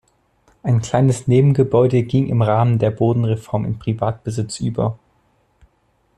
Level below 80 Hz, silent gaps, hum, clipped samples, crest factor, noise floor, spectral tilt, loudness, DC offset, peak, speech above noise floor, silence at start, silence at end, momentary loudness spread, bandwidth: -48 dBFS; none; none; under 0.1%; 14 dB; -62 dBFS; -8 dB/octave; -18 LUFS; under 0.1%; -4 dBFS; 46 dB; 0.65 s; 1.2 s; 9 LU; 10.5 kHz